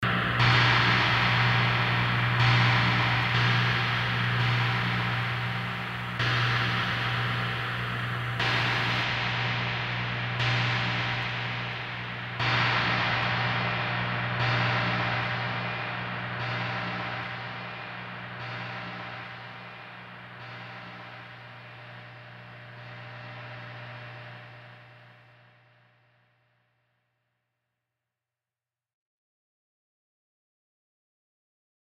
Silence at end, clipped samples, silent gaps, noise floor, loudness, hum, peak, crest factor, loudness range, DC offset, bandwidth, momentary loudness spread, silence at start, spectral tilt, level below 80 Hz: 6.9 s; under 0.1%; none; under -90 dBFS; -26 LUFS; none; -10 dBFS; 20 dB; 19 LU; under 0.1%; 7.8 kHz; 20 LU; 0 s; -5.5 dB/octave; -52 dBFS